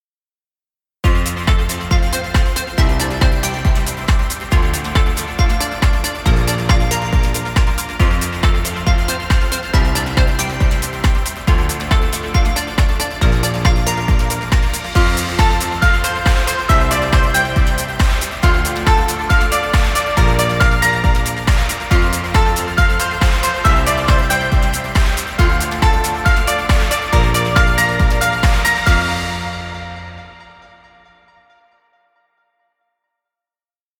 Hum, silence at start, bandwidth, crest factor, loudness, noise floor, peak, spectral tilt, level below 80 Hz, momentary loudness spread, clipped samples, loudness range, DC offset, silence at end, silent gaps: none; 1.05 s; 17.5 kHz; 14 dB; -16 LUFS; under -90 dBFS; 0 dBFS; -4.5 dB/octave; -18 dBFS; 4 LU; under 0.1%; 2 LU; under 0.1%; 3.55 s; none